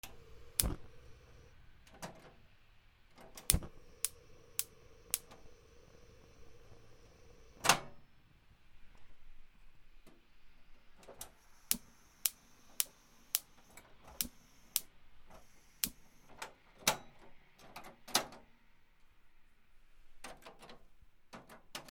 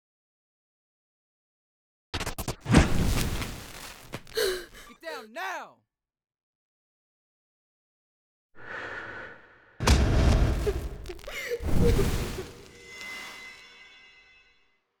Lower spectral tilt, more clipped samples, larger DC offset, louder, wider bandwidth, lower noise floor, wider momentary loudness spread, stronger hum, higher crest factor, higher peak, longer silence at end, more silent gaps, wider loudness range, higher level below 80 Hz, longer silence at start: second, -1.5 dB/octave vs -5.5 dB/octave; neither; neither; second, -38 LUFS vs -29 LUFS; about the same, over 20 kHz vs over 20 kHz; second, -63 dBFS vs -68 dBFS; first, 26 LU vs 22 LU; neither; first, 42 dB vs 24 dB; first, -2 dBFS vs -6 dBFS; second, 0 s vs 1.15 s; second, none vs 6.43-8.49 s; second, 6 LU vs 16 LU; second, -54 dBFS vs -34 dBFS; second, 0.05 s vs 2.15 s